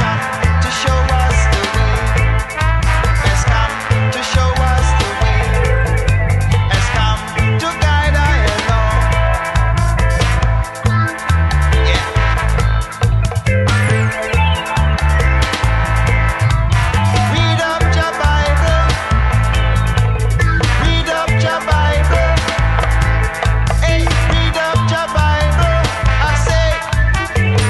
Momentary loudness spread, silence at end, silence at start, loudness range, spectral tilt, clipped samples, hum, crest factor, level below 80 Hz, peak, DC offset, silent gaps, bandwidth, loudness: 2 LU; 0 s; 0 s; 1 LU; -5 dB/octave; under 0.1%; none; 12 dB; -16 dBFS; -2 dBFS; under 0.1%; none; 12 kHz; -14 LUFS